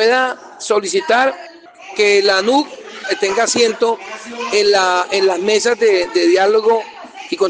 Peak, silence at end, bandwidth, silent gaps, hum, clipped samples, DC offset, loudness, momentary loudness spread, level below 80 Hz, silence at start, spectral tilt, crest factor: -2 dBFS; 0 s; 10 kHz; none; none; under 0.1%; under 0.1%; -15 LUFS; 14 LU; -62 dBFS; 0 s; -2 dB/octave; 14 dB